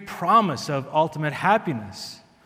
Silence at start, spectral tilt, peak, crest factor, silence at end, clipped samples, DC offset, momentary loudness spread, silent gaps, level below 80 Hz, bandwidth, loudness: 0 s; -5.5 dB/octave; -6 dBFS; 18 dB; 0.3 s; under 0.1%; under 0.1%; 16 LU; none; -66 dBFS; 16.5 kHz; -22 LUFS